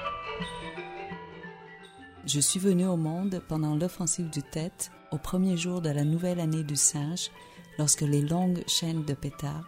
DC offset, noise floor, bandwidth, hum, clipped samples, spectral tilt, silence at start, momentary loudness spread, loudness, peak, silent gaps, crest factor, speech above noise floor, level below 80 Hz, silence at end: under 0.1%; -49 dBFS; 16 kHz; none; under 0.1%; -4.5 dB/octave; 0 s; 17 LU; -28 LUFS; -8 dBFS; none; 20 dB; 21 dB; -54 dBFS; 0 s